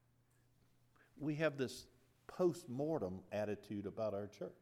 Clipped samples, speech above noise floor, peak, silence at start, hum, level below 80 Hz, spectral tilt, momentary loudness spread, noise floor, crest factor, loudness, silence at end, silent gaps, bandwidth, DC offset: under 0.1%; 33 dB; -24 dBFS; 1.15 s; none; -78 dBFS; -6.5 dB/octave; 8 LU; -74 dBFS; 18 dB; -42 LUFS; 0.05 s; none; 15.5 kHz; under 0.1%